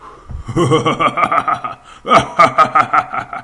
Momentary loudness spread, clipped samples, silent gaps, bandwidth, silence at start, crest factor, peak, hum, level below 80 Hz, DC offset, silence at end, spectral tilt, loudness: 18 LU; under 0.1%; none; 11.5 kHz; 0.05 s; 14 dB; 0 dBFS; none; -40 dBFS; under 0.1%; 0 s; -5 dB/octave; -13 LUFS